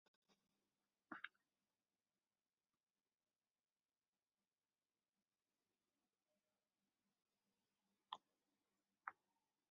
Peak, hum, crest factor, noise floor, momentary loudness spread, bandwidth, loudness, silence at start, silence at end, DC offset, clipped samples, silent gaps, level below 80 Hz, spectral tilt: -32 dBFS; none; 38 dB; under -90 dBFS; 2 LU; 4.9 kHz; -59 LUFS; 0.3 s; 0.6 s; under 0.1%; under 0.1%; 3.51-3.55 s, 4.08-4.13 s; under -90 dBFS; 1 dB/octave